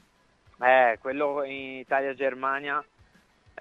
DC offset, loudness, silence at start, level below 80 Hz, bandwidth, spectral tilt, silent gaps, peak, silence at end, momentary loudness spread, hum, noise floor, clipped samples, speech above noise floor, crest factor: under 0.1%; -26 LUFS; 0.6 s; -70 dBFS; 6.6 kHz; -5.5 dB/octave; none; -8 dBFS; 0.8 s; 12 LU; none; -62 dBFS; under 0.1%; 36 dB; 20 dB